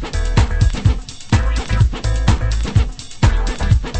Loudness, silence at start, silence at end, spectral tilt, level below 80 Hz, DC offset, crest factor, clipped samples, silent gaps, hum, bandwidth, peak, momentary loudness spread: -18 LUFS; 0 s; 0 s; -5.5 dB/octave; -18 dBFS; under 0.1%; 16 dB; under 0.1%; none; none; 8.8 kHz; 0 dBFS; 3 LU